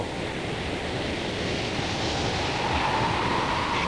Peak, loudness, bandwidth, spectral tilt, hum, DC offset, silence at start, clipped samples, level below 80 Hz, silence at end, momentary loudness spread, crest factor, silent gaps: -14 dBFS; -27 LUFS; 10.5 kHz; -4.5 dB/octave; none; 0.2%; 0 s; under 0.1%; -42 dBFS; 0 s; 5 LU; 14 dB; none